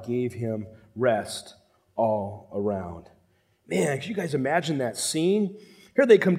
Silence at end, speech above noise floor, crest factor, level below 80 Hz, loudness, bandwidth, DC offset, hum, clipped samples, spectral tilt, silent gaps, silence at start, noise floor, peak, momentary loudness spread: 0 s; 40 dB; 22 dB; -64 dBFS; -26 LUFS; 15.5 kHz; under 0.1%; none; under 0.1%; -5 dB/octave; none; 0 s; -65 dBFS; -4 dBFS; 13 LU